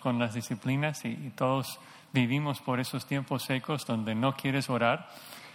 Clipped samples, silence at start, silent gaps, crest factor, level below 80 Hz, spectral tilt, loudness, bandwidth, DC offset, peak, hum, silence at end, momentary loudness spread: under 0.1%; 0 s; none; 18 dB; -70 dBFS; -5.5 dB/octave; -31 LUFS; 17.5 kHz; under 0.1%; -12 dBFS; none; 0 s; 8 LU